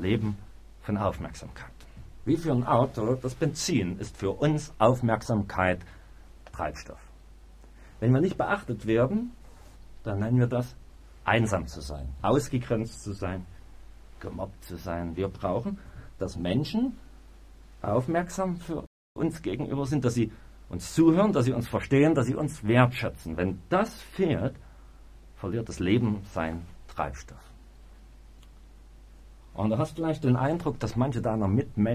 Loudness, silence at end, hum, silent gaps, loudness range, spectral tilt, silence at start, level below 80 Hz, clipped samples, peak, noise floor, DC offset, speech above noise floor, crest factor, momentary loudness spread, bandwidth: -28 LUFS; 0 s; none; 18.87-19.15 s; 7 LU; -7 dB/octave; 0 s; -46 dBFS; under 0.1%; -6 dBFS; -50 dBFS; under 0.1%; 23 dB; 22 dB; 16 LU; 15 kHz